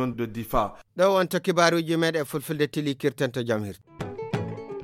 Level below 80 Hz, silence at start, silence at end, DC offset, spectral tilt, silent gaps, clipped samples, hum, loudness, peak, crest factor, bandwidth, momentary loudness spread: -48 dBFS; 0 s; 0 s; under 0.1%; -5.5 dB/octave; none; under 0.1%; none; -26 LUFS; -6 dBFS; 20 dB; 16.5 kHz; 12 LU